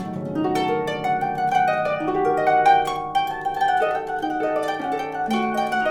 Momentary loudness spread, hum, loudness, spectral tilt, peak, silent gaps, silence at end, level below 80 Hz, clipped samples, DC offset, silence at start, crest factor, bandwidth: 8 LU; none; -22 LUFS; -5.5 dB/octave; -6 dBFS; none; 0 s; -52 dBFS; under 0.1%; under 0.1%; 0 s; 16 dB; 17.5 kHz